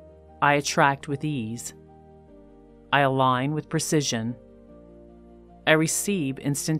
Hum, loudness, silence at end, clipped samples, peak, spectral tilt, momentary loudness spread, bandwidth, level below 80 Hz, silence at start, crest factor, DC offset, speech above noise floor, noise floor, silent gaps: none; -24 LUFS; 0 s; under 0.1%; -4 dBFS; -4 dB/octave; 12 LU; 16 kHz; -58 dBFS; 0 s; 22 dB; under 0.1%; 27 dB; -50 dBFS; none